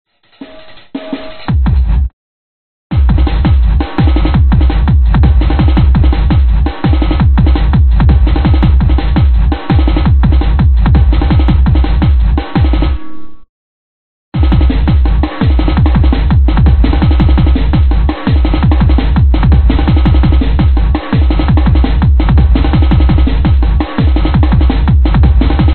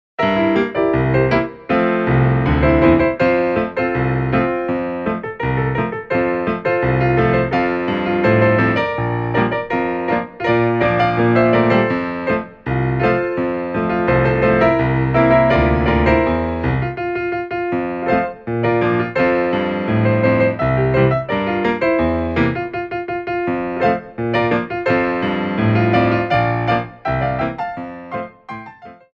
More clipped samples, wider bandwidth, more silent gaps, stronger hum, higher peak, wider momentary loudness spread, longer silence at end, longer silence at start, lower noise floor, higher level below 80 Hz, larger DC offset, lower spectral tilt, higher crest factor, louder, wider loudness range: neither; second, 4.4 kHz vs 6 kHz; first, 2.13-2.90 s, 13.49-14.32 s vs none; neither; about the same, 0 dBFS vs 0 dBFS; second, 4 LU vs 8 LU; second, 0 s vs 0.2 s; second, 0.05 s vs 0.2 s; second, -34 dBFS vs -39 dBFS; first, -10 dBFS vs -34 dBFS; first, 4% vs under 0.1%; second, -7.5 dB/octave vs -9 dB/octave; second, 8 dB vs 16 dB; first, -10 LUFS vs -17 LUFS; about the same, 4 LU vs 4 LU